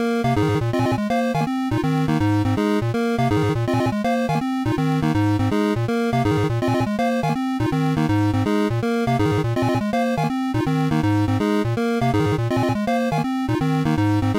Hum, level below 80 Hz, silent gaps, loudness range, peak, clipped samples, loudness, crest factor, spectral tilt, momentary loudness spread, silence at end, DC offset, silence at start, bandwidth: none; -42 dBFS; none; 0 LU; -12 dBFS; under 0.1%; -21 LUFS; 8 dB; -7.5 dB/octave; 2 LU; 0 s; 0.1%; 0 s; 16 kHz